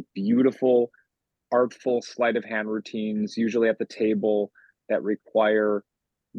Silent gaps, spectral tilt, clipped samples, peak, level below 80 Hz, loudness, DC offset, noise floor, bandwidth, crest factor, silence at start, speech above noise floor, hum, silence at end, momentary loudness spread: none; -6.5 dB/octave; under 0.1%; -8 dBFS; -78 dBFS; -25 LUFS; under 0.1%; -75 dBFS; 8 kHz; 16 dB; 0 s; 51 dB; none; 0 s; 8 LU